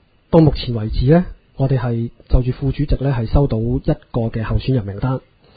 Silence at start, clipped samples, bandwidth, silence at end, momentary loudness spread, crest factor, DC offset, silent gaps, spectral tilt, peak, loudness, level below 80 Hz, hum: 0.3 s; under 0.1%; 5 kHz; 0.4 s; 8 LU; 18 dB; under 0.1%; none; -11.5 dB/octave; 0 dBFS; -18 LUFS; -26 dBFS; none